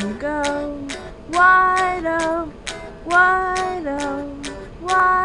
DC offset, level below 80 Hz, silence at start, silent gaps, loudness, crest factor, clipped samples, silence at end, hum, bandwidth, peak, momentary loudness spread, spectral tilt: 0.1%; -42 dBFS; 0 s; none; -18 LUFS; 18 dB; under 0.1%; 0 s; none; 11 kHz; -2 dBFS; 17 LU; -3.5 dB/octave